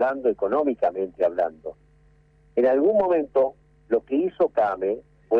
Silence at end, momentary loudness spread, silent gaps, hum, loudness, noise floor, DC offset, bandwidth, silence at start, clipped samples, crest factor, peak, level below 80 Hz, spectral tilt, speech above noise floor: 0 s; 9 LU; none; none; -23 LUFS; -57 dBFS; under 0.1%; 5.2 kHz; 0 s; under 0.1%; 12 dB; -12 dBFS; -60 dBFS; -8.5 dB/octave; 35 dB